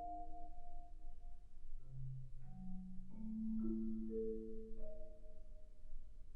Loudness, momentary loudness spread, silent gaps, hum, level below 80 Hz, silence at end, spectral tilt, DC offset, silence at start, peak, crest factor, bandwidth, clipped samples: -49 LUFS; 19 LU; none; none; -50 dBFS; 0 s; -11 dB/octave; under 0.1%; 0 s; -32 dBFS; 12 dB; 1.4 kHz; under 0.1%